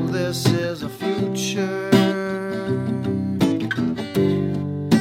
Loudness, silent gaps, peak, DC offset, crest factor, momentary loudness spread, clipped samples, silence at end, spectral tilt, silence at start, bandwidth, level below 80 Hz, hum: -22 LUFS; none; -4 dBFS; under 0.1%; 18 dB; 7 LU; under 0.1%; 0 s; -6 dB/octave; 0 s; 16.5 kHz; -54 dBFS; none